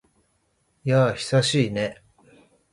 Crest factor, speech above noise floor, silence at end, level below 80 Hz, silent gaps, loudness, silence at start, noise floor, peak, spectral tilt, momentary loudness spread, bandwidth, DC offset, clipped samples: 18 dB; 47 dB; 0.8 s; -58 dBFS; none; -23 LUFS; 0.85 s; -69 dBFS; -8 dBFS; -5.5 dB/octave; 10 LU; 11.5 kHz; under 0.1%; under 0.1%